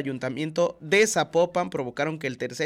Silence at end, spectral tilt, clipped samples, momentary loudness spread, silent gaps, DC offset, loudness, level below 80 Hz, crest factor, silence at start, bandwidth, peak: 0 s; -4 dB/octave; under 0.1%; 10 LU; none; under 0.1%; -25 LUFS; -66 dBFS; 16 dB; 0 s; 16 kHz; -10 dBFS